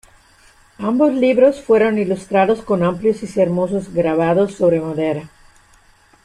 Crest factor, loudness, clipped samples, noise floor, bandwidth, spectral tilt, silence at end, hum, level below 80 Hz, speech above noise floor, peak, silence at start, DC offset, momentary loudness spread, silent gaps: 16 dB; -17 LUFS; under 0.1%; -51 dBFS; 11 kHz; -7.5 dB/octave; 1 s; none; -52 dBFS; 35 dB; -2 dBFS; 0.8 s; under 0.1%; 7 LU; none